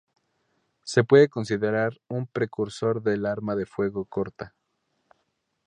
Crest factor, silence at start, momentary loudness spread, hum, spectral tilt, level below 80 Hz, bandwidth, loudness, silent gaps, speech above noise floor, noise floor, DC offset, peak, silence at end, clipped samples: 22 dB; 0.85 s; 15 LU; none; -6.5 dB/octave; -62 dBFS; 9.8 kHz; -25 LUFS; none; 51 dB; -75 dBFS; under 0.1%; -4 dBFS; 1.2 s; under 0.1%